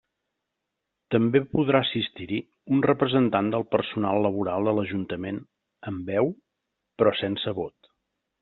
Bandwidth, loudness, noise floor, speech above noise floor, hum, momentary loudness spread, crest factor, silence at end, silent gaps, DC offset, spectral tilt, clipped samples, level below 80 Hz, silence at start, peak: 4.3 kHz; -25 LUFS; -83 dBFS; 58 dB; none; 12 LU; 22 dB; 0.75 s; none; under 0.1%; -5 dB/octave; under 0.1%; -62 dBFS; 1.1 s; -4 dBFS